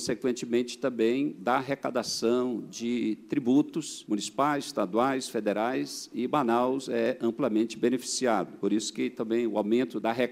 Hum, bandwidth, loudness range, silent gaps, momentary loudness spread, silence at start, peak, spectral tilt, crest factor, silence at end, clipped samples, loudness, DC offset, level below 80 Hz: none; 16 kHz; 1 LU; none; 6 LU; 0 s; -10 dBFS; -4.5 dB/octave; 18 dB; 0 s; under 0.1%; -29 LUFS; under 0.1%; -72 dBFS